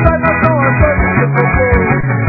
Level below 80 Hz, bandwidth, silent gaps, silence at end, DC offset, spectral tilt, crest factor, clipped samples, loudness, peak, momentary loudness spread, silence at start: -20 dBFS; 4.6 kHz; none; 0 s; under 0.1%; -12 dB/octave; 10 dB; 0.1%; -11 LUFS; 0 dBFS; 1 LU; 0 s